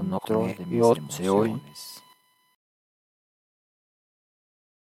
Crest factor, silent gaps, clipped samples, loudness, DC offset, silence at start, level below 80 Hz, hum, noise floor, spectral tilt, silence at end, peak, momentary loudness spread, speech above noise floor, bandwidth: 22 dB; none; under 0.1%; -25 LUFS; under 0.1%; 0 s; -70 dBFS; none; -61 dBFS; -6.5 dB/octave; 3 s; -6 dBFS; 19 LU; 37 dB; 16.5 kHz